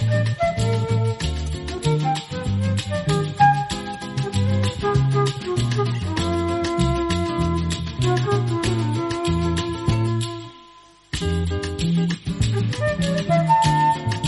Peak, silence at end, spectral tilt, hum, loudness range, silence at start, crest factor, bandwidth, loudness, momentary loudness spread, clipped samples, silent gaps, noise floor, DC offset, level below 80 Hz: -4 dBFS; 0 s; -6 dB/octave; none; 3 LU; 0 s; 16 dB; 11.5 kHz; -22 LUFS; 8 LU; under 0.1%; none; -49 dBFS; under 0.1%; -36 dBFS